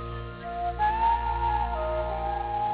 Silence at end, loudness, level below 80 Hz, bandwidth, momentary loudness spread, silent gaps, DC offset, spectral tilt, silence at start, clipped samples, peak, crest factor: 0 s; -28 LUFS; -36 dBFS; 4 kHz; 10 LU; none; under 0.1%; -4.5 dB/octave; 0 s; under 0.1%; -14 dBFS; 12 dB